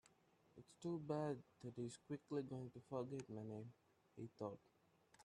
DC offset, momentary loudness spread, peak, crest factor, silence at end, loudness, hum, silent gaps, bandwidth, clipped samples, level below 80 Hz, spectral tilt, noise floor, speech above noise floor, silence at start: under 0.1%; 17 LU; -32 dBFS; 18 dB; 0 s; -51 LUFS; none; none; 11.5 kHz; under 0.1%; -86 dBFS; -7 dB/octave; -76 dBFS; 27 dB; 0.55 s